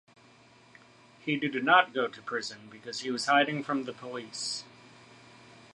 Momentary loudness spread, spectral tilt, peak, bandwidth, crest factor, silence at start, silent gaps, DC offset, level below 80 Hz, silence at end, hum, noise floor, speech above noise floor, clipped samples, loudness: 17 LU; -3.5 dB/octave; -8 dBFS; 11.5 kHz; 24 dB; 1.25 s; none; under 0.1%; -80 dBFS; 0.15 s; none; -58 dBFS; 29 dB; under 0.1%; -29 LUFS